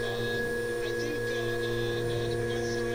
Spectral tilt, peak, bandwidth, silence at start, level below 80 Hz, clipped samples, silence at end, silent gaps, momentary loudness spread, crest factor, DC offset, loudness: -5 dB/octave; -20 dBFS; 16.5 kHz; 0 s; -46 dBFS; under 0.1%; 0 s; none; 1 LU; 12 dB; under 0.1%; -31 LUFS